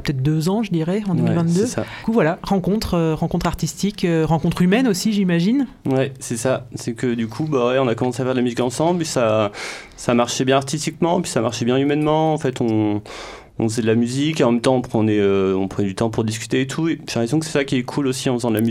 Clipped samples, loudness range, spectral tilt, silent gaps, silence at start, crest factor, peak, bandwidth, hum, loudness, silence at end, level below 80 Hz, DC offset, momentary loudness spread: under 0.1%; 1 LU; -6 dB/octave; none; 0 s; 16 dB; -2 dBFS; 15.5 kHz; none; -20 LUFS; 0 s; -44 dBFS; under 0.1%; 6 LU